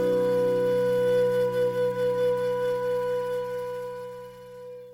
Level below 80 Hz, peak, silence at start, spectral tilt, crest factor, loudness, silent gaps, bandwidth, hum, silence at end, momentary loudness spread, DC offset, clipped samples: -66 dBFS; -16 dBFS; 0 s; -6 dB/octave; 10 dB; -26 LUFS; none; 16 kHz; none; 0 s; 18 LU; under 0.1%; under 0.1%